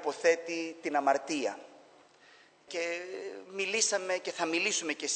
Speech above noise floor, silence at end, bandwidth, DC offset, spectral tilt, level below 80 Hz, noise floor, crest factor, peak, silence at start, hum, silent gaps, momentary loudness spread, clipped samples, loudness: 28 dB; 0 s; 9.2 kHz; under 0.1%; -1 dB/octave; under -90 dBFS; -60 dBFS; 20 dB; -12 dBFS; 0 s; none; none; 12 LU; under 0.1%; -32 LUFS